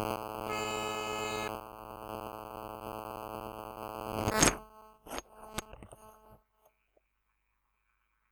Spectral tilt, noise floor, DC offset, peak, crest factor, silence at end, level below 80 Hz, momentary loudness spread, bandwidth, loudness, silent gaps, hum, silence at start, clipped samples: -3 dB/octave; -78 dBFS; under 0.1%; -4 dBFS; 34 dB; 1.95 s; -54 dBFS; 20 LU; over 20 kHz; -36 LUFS; none; 50 Hz at -55 dBFS; 0 s; under 0.1%